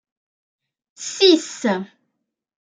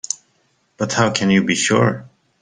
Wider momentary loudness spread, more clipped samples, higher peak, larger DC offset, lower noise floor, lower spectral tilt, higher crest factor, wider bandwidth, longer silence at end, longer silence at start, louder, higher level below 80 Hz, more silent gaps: first, 17 LU vs 12 LU; neither; about the same, -2 dBFS vs 0 dBFS; neither; first, -77 dBFS vs -63 dBFS; about the same, -3 dB/octave vs -4 dB/octave; about the same, 20 dB vs 18 dB; about the same, 9.4 kHz vs 10 kHz; first, 0.8 s vs 0.35 s; first, 1 s vs 0.8 s; about the same, -18 LUFS vs -17 LUFS; second, -76 dBFS vs -56 dBFS; neither